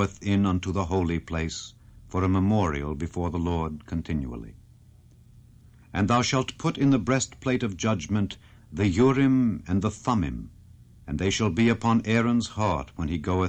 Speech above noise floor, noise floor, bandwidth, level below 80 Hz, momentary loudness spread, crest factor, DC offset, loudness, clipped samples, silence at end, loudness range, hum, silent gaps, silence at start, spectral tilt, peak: 28 dB; -53 dBFS; 9.2 kHz; -44 dBFS; 11 LU; 16 dB; under 0.1%; -26 LUFS; under 0.1%; 0 s; 5 LU; none; none; 0 s; -6 dB/octave; -10 dBFS